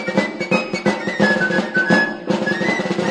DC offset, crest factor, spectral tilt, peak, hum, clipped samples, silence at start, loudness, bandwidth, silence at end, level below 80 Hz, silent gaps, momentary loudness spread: under 0.1%; 16 dB; -5.5 dB/octave; -2 dBFS; none; under 0.1%; 0 s; -18 LUFS; 10 kHz; 0 s; -58 dBFS; none; 5 LU